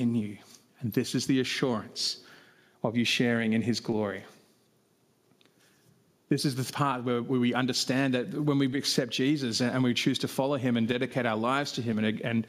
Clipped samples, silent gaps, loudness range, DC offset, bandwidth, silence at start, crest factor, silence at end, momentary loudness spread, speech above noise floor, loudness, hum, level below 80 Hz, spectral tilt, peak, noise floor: under 0.1%; none; 6 LU; under 0.1%; 15.5 kHz; 0 s; 18 dB; 0 s; 5 LU; 40 dB; -28 LUFS; none; -72 dBFS; -5 dB/octave; -10 dBFS; -68 dBFS